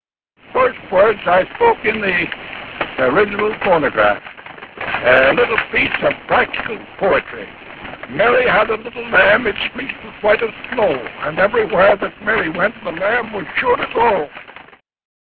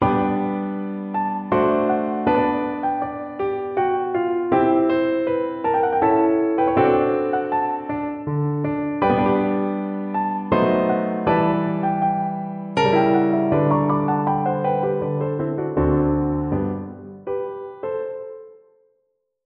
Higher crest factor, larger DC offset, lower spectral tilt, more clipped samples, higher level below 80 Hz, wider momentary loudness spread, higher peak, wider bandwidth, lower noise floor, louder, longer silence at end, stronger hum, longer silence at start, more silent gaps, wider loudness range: about the same, 16 dB vs 16 dB; neither; second, -7.5 dB/octave vs -9 dB/octave; neither; about the same, -46 dBFS vs -44 dBFS; first, 14 LU vs 10 LU; first, 0 dBFS vs -4 dBFS; second, 4.9 kHz vs 6.6 kHz; second, -50 dBFS vs -71 dBFS; first, -16 LUFS vs -21 LUFS; about the same, 0.85 s vs 0.95 s; neither; first, 0.5 s vs 0 s; neither; about the same, 2 LU vs 4 LU